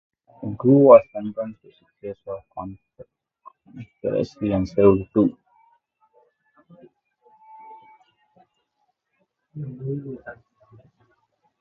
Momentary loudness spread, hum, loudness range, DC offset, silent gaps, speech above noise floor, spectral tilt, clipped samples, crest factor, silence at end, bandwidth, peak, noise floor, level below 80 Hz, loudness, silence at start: 25 LU; none; 18 LU; under 0.1%; none; 53 dB; -10 dB/octave; under 0.1%; 24 dB; 1.3 s; 6.6 kHz; 0 dBFS; -73 dBFS; -52 dBFS; -20 LUFS; 0.4 s